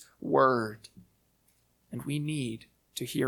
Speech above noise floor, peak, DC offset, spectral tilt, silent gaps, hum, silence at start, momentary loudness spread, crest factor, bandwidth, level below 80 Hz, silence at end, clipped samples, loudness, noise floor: 40 dB; -10 dBFS; under 0.1%; -5.5 dB/octave; none; none; 0 s; 19 LU; 22 dB; 19 kHz; -68 dBFS; 0 s; under 0.1%; -30 LUFS; -70 dBFS